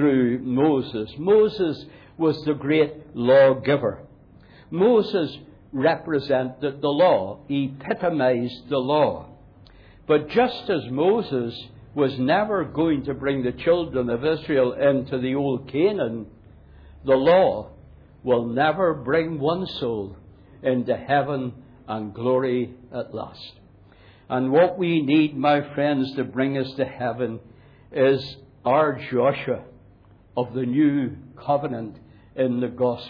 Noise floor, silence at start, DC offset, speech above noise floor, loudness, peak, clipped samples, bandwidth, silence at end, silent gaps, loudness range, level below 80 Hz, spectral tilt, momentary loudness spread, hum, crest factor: -52 dBFS; 0 s; under 0.1%; 30 dB; -22 LUFS; -8 dBFS; under 0.1%; 5.2 kHz; 0 s; none; 4 LU; -54 dBFS; -9 dB/octave; 14 LU; none; 16 dB